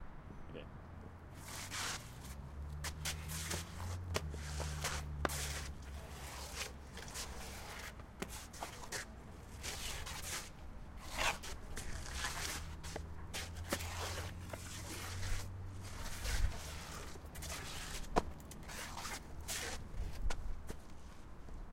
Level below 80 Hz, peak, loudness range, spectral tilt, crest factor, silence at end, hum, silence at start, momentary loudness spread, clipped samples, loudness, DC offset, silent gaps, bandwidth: -48 dBFS; -16 dBFS; 4 LU; -3 dB/octave; 28 dB; 0 s; none; 0 s; 12 LU; under 0.1%; -44 LUFS; under 0.1%; none; 16 kHz